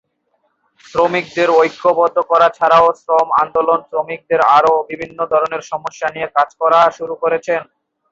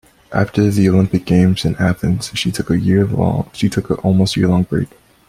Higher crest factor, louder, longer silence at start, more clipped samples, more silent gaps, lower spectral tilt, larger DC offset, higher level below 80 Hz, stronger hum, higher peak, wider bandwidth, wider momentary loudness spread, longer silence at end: about the same, 14 dB vs 14 dB; about the same, -15 LUFS vs -16 LUFS; first, 0.95 s vs 0.3 s; neither; neither; second, -4.5 dB/octave vs -6.5 dB/octave; neither; second, -58 dBFS vs -40 dBFS; neither; about the same, 0 dBFS vs -2 dBFS; second, 7.6 kHz vs 14.5 kHz; first, 11 LU vs 6 LU; about the same, 0.5 s vs 0.45 s